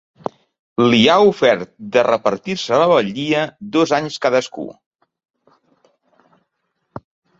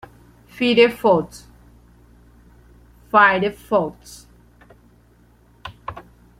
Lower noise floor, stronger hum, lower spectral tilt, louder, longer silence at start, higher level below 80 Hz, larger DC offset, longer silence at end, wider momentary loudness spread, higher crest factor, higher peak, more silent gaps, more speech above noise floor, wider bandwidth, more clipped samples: first, -72 dBFS vs -53 dBFS; neither; about the same, -5 dB/octave vs -5 dB/octave; about the same, -16 LUFS vs -17 LUFS; first, 0.8 s vs 0.55 s; second, -58 dBFS vs -52 dBFS; neither; about the same, 0.4 s vs 0.4 s; second, 20 LU vs 26 LU; about the same, 18 dB vs 22 dB; about the same, 0 dBFS vs -2 dBFS; first, 4.86-4.91 s, 5.30-5.34 s vs none; first, 56 dB vs 36 dB; second, 7.8 kHz vs 15.5 kHz; neither